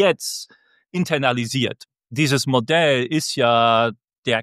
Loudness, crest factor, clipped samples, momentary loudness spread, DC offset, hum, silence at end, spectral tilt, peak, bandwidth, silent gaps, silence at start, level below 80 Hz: -19 LUFS; 18 dB; under 0.1%; 13 LU; under 0.1%; none; 0 s; -4.5 dB/octave; -2 dBFS; 15 kHz; 4.18-4.23 s; 0 s; -64 dBFS